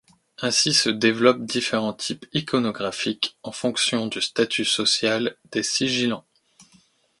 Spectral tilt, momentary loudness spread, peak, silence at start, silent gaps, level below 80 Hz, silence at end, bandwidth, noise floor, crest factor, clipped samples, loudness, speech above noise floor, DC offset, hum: -3 dB/octave; 9 LU; -2 dBFS; 0.4 s; none; -64 dBFS; 0.55 s; 11.5 kHz; -59 dBFS; 22 dB; under 0.1%; -22 LUFS; 36 dB; under 0.1%; none